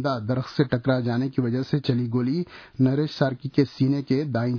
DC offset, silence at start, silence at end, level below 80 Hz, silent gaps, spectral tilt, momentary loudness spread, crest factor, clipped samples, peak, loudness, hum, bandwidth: under 0.1%; 0 s; 0 s; -58 dBFS; none; -8.5 dB/octave; 4 LU; 16 dB; under 0.1%; -6 dBFS; -24 LUFS; none; 5.4 kHz